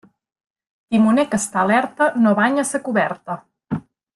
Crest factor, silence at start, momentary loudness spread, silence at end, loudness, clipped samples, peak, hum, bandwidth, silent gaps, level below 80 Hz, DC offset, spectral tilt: 16 dB; 0.9 s; 13 LU; 0.35 s; -18 LUFS; under 0.1%; -4 dBFS; none; 12.5 kHz; none; -60 dBFS; under 0.1%; -5 dB/octave